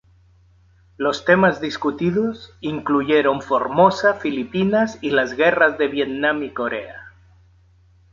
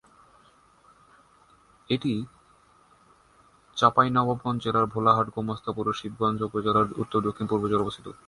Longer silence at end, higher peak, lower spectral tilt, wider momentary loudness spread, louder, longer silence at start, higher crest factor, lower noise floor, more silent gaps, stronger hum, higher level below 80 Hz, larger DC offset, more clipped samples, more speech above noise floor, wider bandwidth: first, 1.05 s vs 0.15 s; first, -2 dBFS vs -6 dBFS; about the same, -6 dB/octave vs -7 dB/octave; about the same, 10 LU vs 9 LU; first, -19 LUFS vs -26 LUFS; second, 1 s vs 1.9 s; about the same, 18 dB vs 22 dB; second, -54 dBFS vs -59 dBFS; neither; neither; about the same, -54 dBFS vs -58 dBFS; neither; neither; about the same, 35 dB vs 34 dB; second, 7.6 kHz vs 11.5 kHz